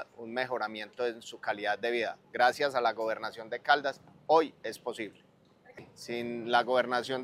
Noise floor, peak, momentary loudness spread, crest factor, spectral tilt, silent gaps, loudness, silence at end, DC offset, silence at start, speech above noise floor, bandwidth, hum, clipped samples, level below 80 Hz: -60 dBFS; -10 dBFS; 12 LU; 22 dB; -3.5 dB/octave; none; -31 LUFS; 0 s; under 0.1%; 0 s; 29 dB; 15.5 kHz; none; under 0.1%; -80 dBFS